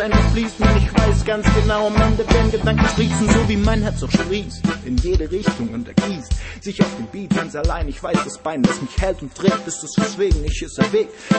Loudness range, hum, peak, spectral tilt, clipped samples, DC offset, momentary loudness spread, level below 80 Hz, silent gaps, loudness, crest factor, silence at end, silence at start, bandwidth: 5 LU; none; -2 dBFS; -6 dB/octave; under 0.1%; under 0.1%; 8 LU; -24 dBFS; none; -19 LUFS; 16 dB; 0 s; 0 s; 8.8 kHz